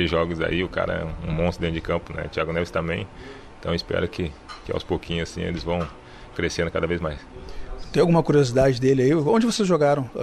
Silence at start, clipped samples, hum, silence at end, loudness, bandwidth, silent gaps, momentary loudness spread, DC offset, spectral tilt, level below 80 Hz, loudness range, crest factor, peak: 0 s; under 0.1%; none; 0 s; -23 LUFS; 12.5 kHz; none; 17 LU; under 0.1%; -6 dB/octave; -40 dBFS; 7 LU; 16 dB; -6 dBFS